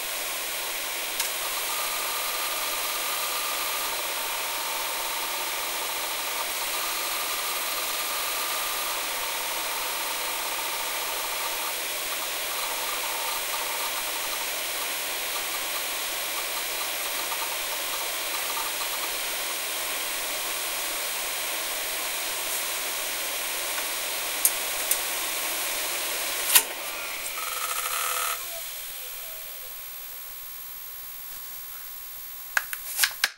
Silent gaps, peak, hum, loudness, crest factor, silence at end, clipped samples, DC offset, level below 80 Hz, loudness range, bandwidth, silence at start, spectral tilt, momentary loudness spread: none; 0 dBFS; none; -27 LUFS; 30 dB; 0 s; under 0.1%; under 0.1%; -62 dBFS; 5 LU; 16 kHz; 0 s; 2 dB/octave; 7 LU